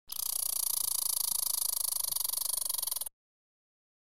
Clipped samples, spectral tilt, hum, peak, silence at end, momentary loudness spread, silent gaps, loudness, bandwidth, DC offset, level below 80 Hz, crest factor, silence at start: under 0.1%; 3 dB/octave; none; -14 dBFS; 0.9 s; 4 LU; none; -30 LUFS; 17 kHz; 0.3%; -74 dBFS; 20 dB; 0.05 s